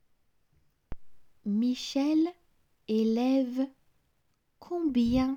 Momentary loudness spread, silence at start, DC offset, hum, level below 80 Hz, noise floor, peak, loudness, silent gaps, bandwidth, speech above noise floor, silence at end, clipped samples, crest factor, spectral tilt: 10 LU; 0.9 s; under 0.1%; none; -54 dBFS; -73 dBFS; -16 dBFS; -29 LUFS; none; 15 kHz; 46 dB; 0 s; under 0.1%; 16 dB; -6 dB/octave